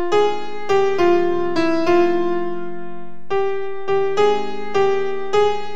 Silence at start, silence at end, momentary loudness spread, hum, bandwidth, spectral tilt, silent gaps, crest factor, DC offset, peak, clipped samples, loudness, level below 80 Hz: 0 s; 0 s; 11 LU; none; 8 kHz; -5.5 dB/octave; none; 14 dB; 8%; -4 dBFS; under 0.1%; -19 LUFS; -60 dBFS